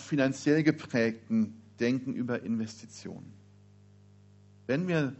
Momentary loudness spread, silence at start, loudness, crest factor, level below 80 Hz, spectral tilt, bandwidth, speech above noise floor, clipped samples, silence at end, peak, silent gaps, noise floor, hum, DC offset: 18 LU; 0 s; -30 LUFS; 20 dB; -72 dBFS; -6 dB/octave; 8 kHz; 27 dB; under 0.1%; 0.05 s; -12 dBFS; none; -57 dBFS; 50 Hz at -55 dBFS; under 0.1%